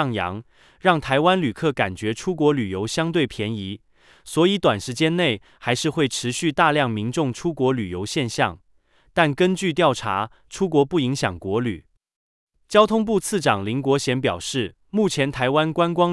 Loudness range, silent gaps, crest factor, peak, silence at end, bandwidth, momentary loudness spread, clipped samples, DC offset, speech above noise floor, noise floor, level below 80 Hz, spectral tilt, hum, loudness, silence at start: 2 LU; 12.16-12.47 s; 20 dB; -2 dBFS; 0 s; 12 kHz; 9 LU; under 0.1%; under 0.1%; 37 dB; -58 dBFS; -54 dBFS; -5 dB/octave; none; -22 LUFS; 0 s